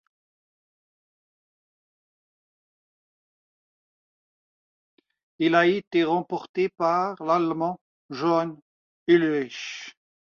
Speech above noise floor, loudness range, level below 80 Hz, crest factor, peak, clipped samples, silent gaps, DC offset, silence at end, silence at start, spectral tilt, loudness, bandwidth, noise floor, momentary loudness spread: over 66 dB; 4 LU; -72 dBFS; 20 dB; -8 dBFS; under 0.1%; 5.87-5.91 s, 6.49-6.54 s, 7.81-8.09 s, 8.62-9.06 s; under 0.1%; 0.45 s; 5.4 s; -6 dB/octave; -24 LUFS; 7 kHz; under -90 dBFS; 15 LU